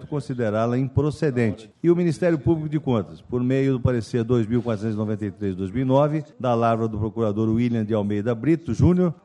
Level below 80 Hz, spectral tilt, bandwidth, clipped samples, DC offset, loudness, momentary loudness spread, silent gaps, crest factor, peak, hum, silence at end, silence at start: -46 dBFS; -8.5 dB/octave; 11 kHz; under 0.1%; under 0.1%; -23 LUFS; 6 LU; none; 16 dB; -6 dBFS; none; 0.1 s; 0 s